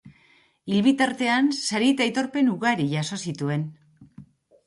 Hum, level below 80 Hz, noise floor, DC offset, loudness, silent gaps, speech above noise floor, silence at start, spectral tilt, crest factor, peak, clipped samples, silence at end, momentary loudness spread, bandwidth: none; -68 dBFS; -60 dBFS; under 0.1%; -23 LUFS; none; 37 dB; 0.05 s; -5 dB/octave; 16 dB; -8 dBFS; under 0.1%; 0.45 s; 9 LU; 11.5 kHz